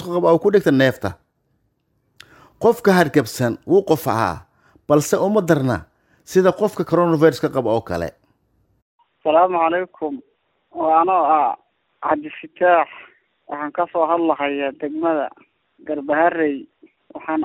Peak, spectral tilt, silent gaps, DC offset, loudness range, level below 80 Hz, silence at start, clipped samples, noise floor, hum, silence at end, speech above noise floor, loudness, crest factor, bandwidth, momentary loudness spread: -2 dBFS; -6 dB/octave; 8.82-8.99 s; under 0.1%; 3 LU; -56 dBFS; 0 s; under 0.1%; -67 dBFS; none; 0 s; 49 dB; -19 LUFS; 18 dB; 17 kHz; 13 LU